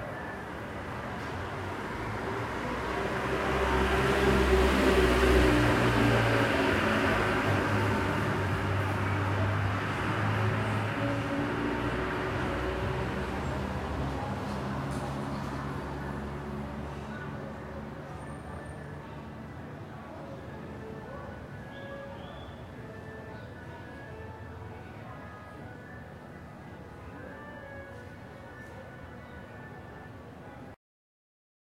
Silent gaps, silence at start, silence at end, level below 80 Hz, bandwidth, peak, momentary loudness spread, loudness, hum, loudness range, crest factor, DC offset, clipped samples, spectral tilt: none; 0 s; 0.9 s; -42 dBFS; 16 kHz; -10 dBFS; 20 LU; -30 LUFS; none; 20 LU; 20 dB; under 0.1%; under 0.1%; -6 dB/octave